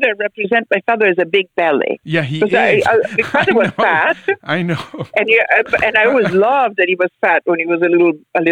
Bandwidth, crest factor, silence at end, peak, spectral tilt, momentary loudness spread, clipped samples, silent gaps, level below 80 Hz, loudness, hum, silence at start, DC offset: 10.5 kHz; 14 dB; 0 s; 0 dBFS; -6.5 dB/octave; 6 LU; under 0.1%; none; -56 dBFS; -14 LUFS; none; 0 s; under 0.1%